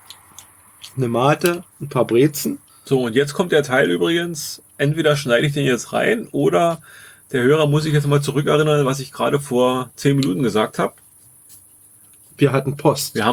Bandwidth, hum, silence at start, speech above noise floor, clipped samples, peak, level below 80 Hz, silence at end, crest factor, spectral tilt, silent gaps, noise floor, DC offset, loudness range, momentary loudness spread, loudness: over 20 kHz; none; 0.85 s; 31 dB; under 0.1%; -2 dBFS; -58 dBFS; 0 s; 18 dB; -5.5 dB/octave; none; -49 dBFS; under 0.1%; 3 LU; 9 LU; -18 LUFS